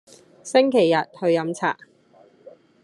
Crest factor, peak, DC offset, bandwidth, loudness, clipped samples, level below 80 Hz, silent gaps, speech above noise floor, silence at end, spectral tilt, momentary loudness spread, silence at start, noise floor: 20 dB; -4 dBFS; under 0.1%; 11.5 kHz; -21 LUFS; under 0.1%; -76 dBFS; none; 34 dB; 1.1 s; -5 dB/octave; 13 LU; 0.45 s; -54 dBFS